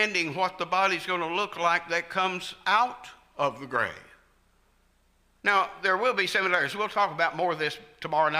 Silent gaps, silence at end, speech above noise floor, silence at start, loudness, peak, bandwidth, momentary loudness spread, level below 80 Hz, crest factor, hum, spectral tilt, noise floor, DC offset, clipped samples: none; 0 s; 38 dB; 0 s; -26 LUFS; -10 dBFS; 15.5 kHz; 6 LU; -66 dBFS; 18 dB; none; -3.5 dB/octave; -65 dBFS; under 0.1%; under 0.1%